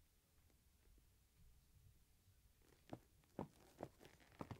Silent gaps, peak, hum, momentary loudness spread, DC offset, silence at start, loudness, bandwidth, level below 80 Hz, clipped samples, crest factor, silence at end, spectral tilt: none; -34 dBFS; none; 8 LU; under 0.1%; 0 s; -60 LUFS; 16 kHz; -76 dBFS; under 0.1%; 28 dB; 0 s; -6.5 dB/octave